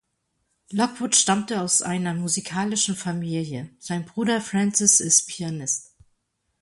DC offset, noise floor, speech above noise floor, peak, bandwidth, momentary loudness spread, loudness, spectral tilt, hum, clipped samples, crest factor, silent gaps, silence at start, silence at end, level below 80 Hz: under 0.1%; -74 dBFS; 51 dB; 0 dBFS; 11.5 kHz; 13 LU; -22 LUFS; -3 dB/octave; none; under 0.1%; 24 dB; none; 0.7 s; 0.8 s; -64 dBFS